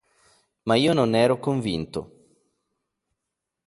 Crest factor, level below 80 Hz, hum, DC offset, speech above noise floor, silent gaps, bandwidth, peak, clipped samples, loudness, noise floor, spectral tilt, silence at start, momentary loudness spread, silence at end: 20 dB; -56 dBFS; none; under 0.1%; 62 dB; none; 11.5 kHz; -6 dBFS; under 0.1%; -22 LUFS; -84 dBFS; -6 dB/octave; 0.65 s; 14 LU; 1.6 s